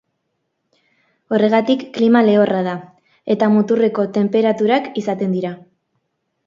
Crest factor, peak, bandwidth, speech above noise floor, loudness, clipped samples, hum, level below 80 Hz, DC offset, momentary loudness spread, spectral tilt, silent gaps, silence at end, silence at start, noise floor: 18 dB; 0 dBFS; 7.2 kHz; 57 dB; -16 LUFS; under 0.1%; none; -66 dBFS; under 0.1%; 11 LU; -7.5 dB/octave; none; 0.9 s; 1.3 s; -72 dBFS